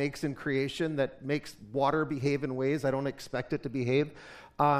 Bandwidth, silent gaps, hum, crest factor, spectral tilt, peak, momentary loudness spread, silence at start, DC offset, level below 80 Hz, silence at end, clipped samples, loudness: 15 kHz; none; none; 20 dB; -6.5 dB/octave; -12 dBFS; 7 LU; 0 s; under 0.1%; -60 dBFS; 0 s; under 0.1%; -31 LUFS